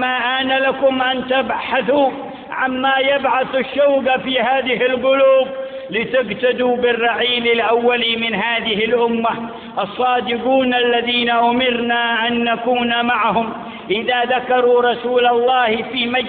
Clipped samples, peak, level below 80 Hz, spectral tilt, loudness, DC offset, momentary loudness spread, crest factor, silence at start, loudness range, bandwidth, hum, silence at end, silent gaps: under 0.1%; -4 dBFS; -54 dBFS; -9 dB/octave; -16 LUFS; under 0.1%; 6 LU; 12 dB; 0 s; 1 LU; 4.6 kHz; none; 0 s; none